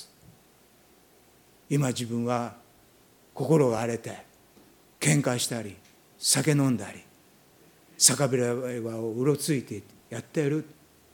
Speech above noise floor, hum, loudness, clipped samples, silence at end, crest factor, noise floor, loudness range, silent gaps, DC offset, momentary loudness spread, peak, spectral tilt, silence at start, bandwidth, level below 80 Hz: 33 dB; none; -26 LUFS; under 0.1%; 0.4 s; 26 dB; -59 dBFS; 4 LU; none; under 0.1%; 19 LU; -4 dBFS; -4 dB/octave; 0 s; 19 kHz; -70 dBFS